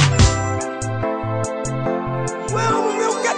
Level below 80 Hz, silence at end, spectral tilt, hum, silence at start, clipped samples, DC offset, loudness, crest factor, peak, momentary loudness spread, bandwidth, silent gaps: -32 dBFS; 0 s; -5 dB/octave; none; 0 s; under 0.1%; under 0.1%; -20 LUFS; 18 dB; -2 dBFS; 8 LU; 10.5 kHz; none